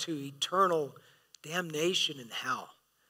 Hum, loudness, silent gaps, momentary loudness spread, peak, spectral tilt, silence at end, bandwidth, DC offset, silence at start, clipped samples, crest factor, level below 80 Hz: none; -32 LUFS; none; 10 LU; -14 dBFS; -3 dB/octave; 0.4 s; 16 kHz; under 0.1%; 0 s; under 0.1%; 20 dB; -90 dBFS